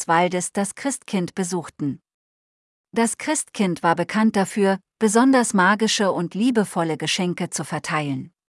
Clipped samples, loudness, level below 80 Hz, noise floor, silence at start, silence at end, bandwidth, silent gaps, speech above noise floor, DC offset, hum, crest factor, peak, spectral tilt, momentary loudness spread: under 0.1%; -21 LUFS; -68 dBFS; under -90 dBFS; 0 s; 0.25 s; 12 kHz; 2.14-2.84 s; over 69 dB; under 0.1%; none; 18 dB; -4 dBFS; -4 dB/octave; 10 LU